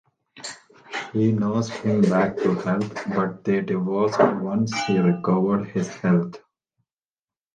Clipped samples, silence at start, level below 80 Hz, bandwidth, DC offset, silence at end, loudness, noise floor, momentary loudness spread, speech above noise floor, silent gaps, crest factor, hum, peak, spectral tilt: under 0.1%; 0.35 s; -62 dBFS; 9.2 kHz; under 0.1%; 1.2 s; -22 LUFS; under -90 dBFS; 13 LU; over 68 dB; none; 20 dB; none; -4 dBFS; -7 dB/octave